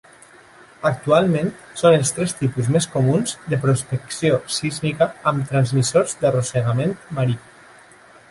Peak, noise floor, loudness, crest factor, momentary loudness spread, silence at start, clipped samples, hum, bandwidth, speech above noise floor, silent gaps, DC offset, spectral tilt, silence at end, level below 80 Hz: -2 dBFS; -47 dBFS; -20 LUFS; 18 dB; 7 LU; 0.8 s; under 0.1%; none; 11.5 kHz; 28 dB; none; under 0.1%; -5.5 dB/octave; 0.9 s; -54 dBFS